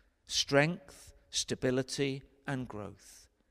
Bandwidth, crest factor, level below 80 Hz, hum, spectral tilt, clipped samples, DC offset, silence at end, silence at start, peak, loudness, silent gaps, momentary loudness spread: 15.5 kHz; 22 dB; -62 dBFS; none; -3.5 dB/octave; under 0.1%; under 0.1%; 0.3 s; 0.3 s; -12 dBFS; -33 LUFS; none; 17 LU